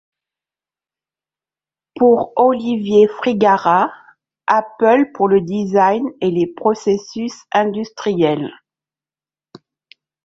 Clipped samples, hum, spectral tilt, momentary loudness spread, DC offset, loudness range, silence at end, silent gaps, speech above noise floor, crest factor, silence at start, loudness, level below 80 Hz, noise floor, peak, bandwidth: under 0.1%; none; -6.5 dB/octave; 8 LU; under 0.1%; 5 LU; 1.75 s; none; over 75 dB; 16 dB; 1.95 s; -16 LUFS; -60 dBFS; under -90 dBFS; -2 dBFS; 7.6 kHz